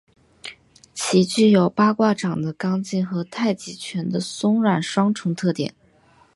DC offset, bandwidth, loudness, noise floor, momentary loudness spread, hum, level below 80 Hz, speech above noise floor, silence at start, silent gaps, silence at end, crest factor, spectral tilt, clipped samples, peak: under 0.1%; 11.5 kHz; -21 LUFS; -56 dBFS; 14 LU; none; -64 dBFS; 36 dB; 0.45 s; none; 0.65 s; 18 dB; -5.5 dB/octave; under 0.1%; -4 dBFS